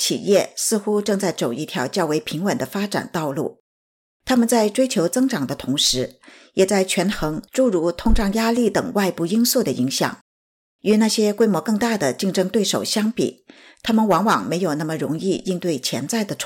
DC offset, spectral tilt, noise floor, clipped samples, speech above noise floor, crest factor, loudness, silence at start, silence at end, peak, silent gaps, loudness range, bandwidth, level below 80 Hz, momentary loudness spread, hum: under 0.1%; -4 dB/octave; under -90 dBFS; under 0.1%; over 70 dB; 14 dB; -20 LUFS; 0 s; 0 s; -6 dBFS; 3.60-4.20 s, 10.21-10.79 s; 3 LU; 17 kHz; -36 dBFS; 7 LU; none